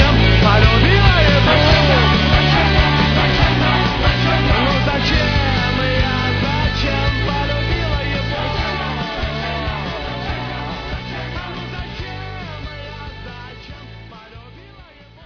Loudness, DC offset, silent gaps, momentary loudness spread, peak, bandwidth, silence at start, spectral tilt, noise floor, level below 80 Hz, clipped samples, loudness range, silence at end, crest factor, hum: -16 LUFS; under 0.1%; none; 18 LU; 0 dBFS; 5.4 kHz; 0 s; -6 dB/octave; -42 dBFS; -24 dBFS; under 0.1%; 16 LU; 0 s; 16 dB; none